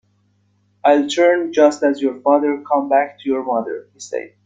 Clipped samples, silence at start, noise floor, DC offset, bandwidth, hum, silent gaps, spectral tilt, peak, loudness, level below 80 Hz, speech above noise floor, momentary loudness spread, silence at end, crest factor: under 0.1%; 0.85 s; -61 dBFS; under 0.1%; 9.2 kHz; none; none; -3.5 dB/octave; -2 dBFS; -17 LUFS; -68 dBFS; 44 dB; 14 LU; 0.2 s; 16 dB